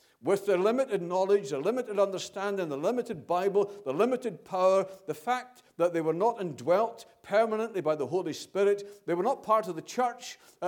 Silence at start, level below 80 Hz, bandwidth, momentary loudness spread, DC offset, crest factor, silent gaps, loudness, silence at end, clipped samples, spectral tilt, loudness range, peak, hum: 0.25 s; -80 dBFS; 18 kHz; 7 LU; under 0.1%; 16 dB; none; -29 LUFS; 0 s; under 0.1%; -5.5 dB/octave; 1 LU; -12 dBFS; none